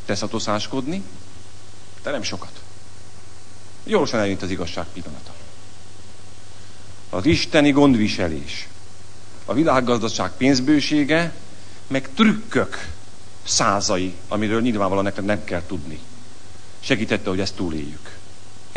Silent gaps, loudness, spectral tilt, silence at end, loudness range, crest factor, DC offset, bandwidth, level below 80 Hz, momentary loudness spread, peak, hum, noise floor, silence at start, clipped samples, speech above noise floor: none; -21 LUFS; -4.5 dB/octave; 0 s; 8 LU; 22 dB; 5%; 10.5 kHz; -48 dBFS; 23 LU; 0 dBFS; none; -45 dBFS; 0.05 s; under 0.1%; 24 dB